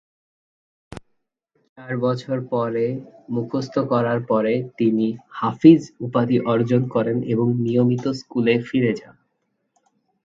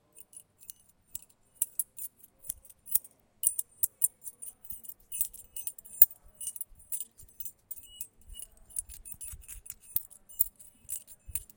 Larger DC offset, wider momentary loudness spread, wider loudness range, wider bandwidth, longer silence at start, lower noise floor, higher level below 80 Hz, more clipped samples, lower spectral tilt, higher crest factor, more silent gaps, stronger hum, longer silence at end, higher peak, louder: neither; second, 9 LU vs 18 LU; second, 8 LU vs 11 LU; second, 7.6 kHz vs 17.5 kHz; first, 0.9 s vs 0.35 s; first, -73 dBFS vs -54 dBFS; about the same, -60 dBFS vs -60 dBFS; neither; first, -8 dB/octave vs 0 dB/octave; second, 22 dB vs 34 dB; first, 1.69-1.76 s vs none; neither; first, 1.25 s vs 0.1 s; about the same, 0 dBFS vs -2 dBFS; first, -21 LUFS vs -31 LUFS